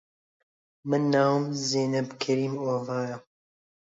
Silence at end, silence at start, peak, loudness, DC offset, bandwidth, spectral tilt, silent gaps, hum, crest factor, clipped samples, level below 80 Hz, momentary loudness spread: 0.75 s; 0.85 s; -12 dBFS; -27 LUFS; under 0.1%; 7.8 kHz; -5.5 dB/octave; none; none; 18 dB; under 0.1%; -76 dBFS; 11 LU